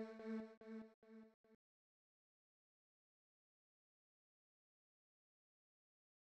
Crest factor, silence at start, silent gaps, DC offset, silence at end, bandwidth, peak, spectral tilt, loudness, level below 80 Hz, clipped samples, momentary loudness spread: 20 dB; 0 s; 0.57-0.61 s, 0.94-1.02 s, 1.34-1.44 s; under 0.1%; 4.75 s; 8 kHz; -40 dBFS; -6 dB/octave; -54 LUFS; under -90 dBFS; under 0.1%; 15 LU